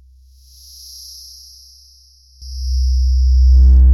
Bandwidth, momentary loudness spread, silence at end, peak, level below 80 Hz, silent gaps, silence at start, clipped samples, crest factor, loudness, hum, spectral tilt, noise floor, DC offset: 11.5 kHz; 26 LU; 0 s; -4 dBFS; -14 dBFS; none; 2.4 s; under 0.1%; 10 dB; -14 LUFS; none; -6.5 dB/octave; -47 dBFS; under 0.1%